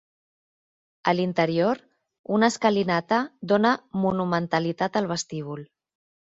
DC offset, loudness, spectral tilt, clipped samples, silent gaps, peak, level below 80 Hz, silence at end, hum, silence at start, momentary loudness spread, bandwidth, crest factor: under 0.1%; -24 LUFS; -5.5 dB/octave; under 0.1%; 2.19-2.24 s; -4 dBFS; -64 dBFS; 0.65 s; none; 1.05 s; 11 LU; 8 kHz; 22 dB